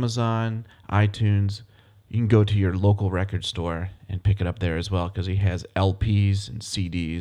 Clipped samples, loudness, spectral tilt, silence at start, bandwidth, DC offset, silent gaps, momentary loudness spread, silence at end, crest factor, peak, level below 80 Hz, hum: under 0.1%; -24 LUFS; -7 dB/octave; 0 s; 10.5 kHz; under 0.1%; none; 9 LU; 0 s; 18 dB; -6 dBFS; -42 dBFS; none